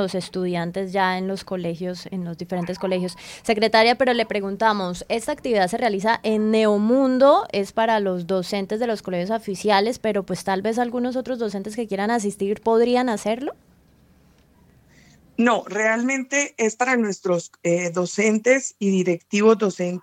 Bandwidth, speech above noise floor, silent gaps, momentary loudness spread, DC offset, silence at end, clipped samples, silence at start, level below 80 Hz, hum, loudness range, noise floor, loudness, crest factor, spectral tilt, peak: 15.5 kHz; 34 dB; none; 10 LU; under 0.1%; 0.05 s; under 0.1%; 0 s; -58 dBFS; none; 5 LU; -55 dBFS; -22 LUFS; 18 dB; -4.5 dB/octave; -4 dBFS